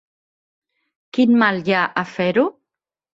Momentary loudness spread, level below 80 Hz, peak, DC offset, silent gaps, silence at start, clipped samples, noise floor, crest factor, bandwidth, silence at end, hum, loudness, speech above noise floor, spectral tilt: 8 LU; -66 dBFS; -4 dBFS; under 0.1%; none; 1.15 s; under 0.1%; -85 dBFS; 18 dB; 7.4 kHz; 0.65 s; none; -18 LUFS; 67 dB; -7 dB/octave